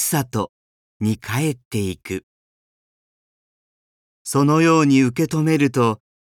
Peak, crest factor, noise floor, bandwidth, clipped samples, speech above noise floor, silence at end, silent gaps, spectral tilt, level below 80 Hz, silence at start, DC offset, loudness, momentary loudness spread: -4 dBFS; 16 dB; under -90 dBFS; 18 kHz; under 0.1%; over 72 dB; 0.3 s; 0.49-1.00 s, 1.65-1.71 s, 2.23-4.25 s; -5.5 dB/octave; -58 dBFS; 0 s; under 0.1%; -19 LUFS; 15 LU